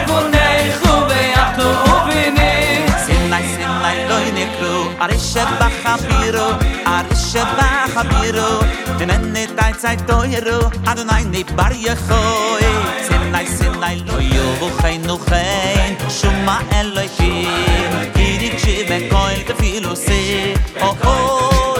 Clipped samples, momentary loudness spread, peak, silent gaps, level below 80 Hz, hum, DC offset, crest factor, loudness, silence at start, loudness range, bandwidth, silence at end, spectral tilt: under 0.1%; 5 LU; 0 dBFS; none; -20 dBFS; none; under 0.1%; 14 dB; -15 LUFS; 0 s; 3 LU; 16 kHz; 0 s; -4.5 dB/octave